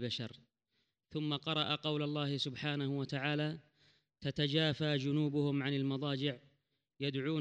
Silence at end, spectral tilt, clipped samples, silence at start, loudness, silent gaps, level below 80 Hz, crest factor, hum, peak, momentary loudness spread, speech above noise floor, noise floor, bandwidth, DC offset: 0 s; -6.5 dB/octave; under 0.1%; 0 s; -36 LUFS; none; -74 dBFS; 18 dB; none; -18 dBFS; 8 LU; 47 dB; -83 dBFS; 8.8 kHz; under 0.1%